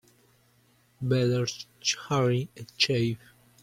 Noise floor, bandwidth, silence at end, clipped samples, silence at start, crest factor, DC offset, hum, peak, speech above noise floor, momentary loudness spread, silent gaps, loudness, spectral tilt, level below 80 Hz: -64 dBFS; 15 kHz; 0.45 s; under 0.1%; 1 s; 20 dB; under 0.1%; none; -10 dBFS; 37 dB; 10 LU; none; -27 LUFS; -4.5 dB/octave; -64 dBFS